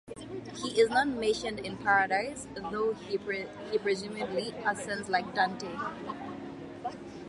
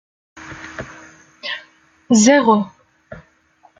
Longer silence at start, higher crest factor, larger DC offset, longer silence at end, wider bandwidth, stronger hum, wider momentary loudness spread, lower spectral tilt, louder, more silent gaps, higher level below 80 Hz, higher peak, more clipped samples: second, 0.05 s vs 0.35 s; about the same, 20 dB vs 18 dB; neither; second, 0 s vs 0.6 s; first, 11.5 kHz vs 9.6 kHz; neither; second, 14 LU vs 24 LU; about the same, -4 dB/octave vs -4 dB/octave; second, -31 LUFS vs -15 LUFS; neither; second, -62 dBFS vs -56 dBFS; second, -12 dBFS vs -2 dBFS; neither